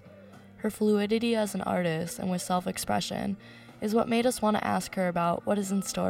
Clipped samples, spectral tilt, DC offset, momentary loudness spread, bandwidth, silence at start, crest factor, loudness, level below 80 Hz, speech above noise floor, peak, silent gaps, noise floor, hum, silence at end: under 0.1%; -5 dB/octave; under 0.1%; 9 LU; 16 kHz; 0.05 s; 16 dB; -29 LUFS; -60 dBFS; 22 dB; -12 dBFS; none; -50 dBFS; none; 0 s